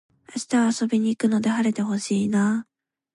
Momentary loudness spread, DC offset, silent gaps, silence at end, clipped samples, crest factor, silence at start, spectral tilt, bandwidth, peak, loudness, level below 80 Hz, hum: 6 LU; under 0.1%; none; 0.55 s; under 0.1%; 12 dB; 0.3 s; -5.5 dB/octave; 11.5 kHz; -10 dBFS; -23 LUFS; -70 dBFS; none